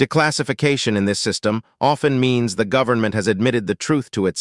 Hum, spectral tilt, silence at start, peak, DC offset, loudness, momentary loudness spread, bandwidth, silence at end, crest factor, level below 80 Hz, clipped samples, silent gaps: none; -5 dB/octave; 0 s; -2 dBFS; under 0.1%; -19 LUFS; 4 LU; 12 kHz; 0 s; 16 dB; -56 dBFS; under 0.1%; none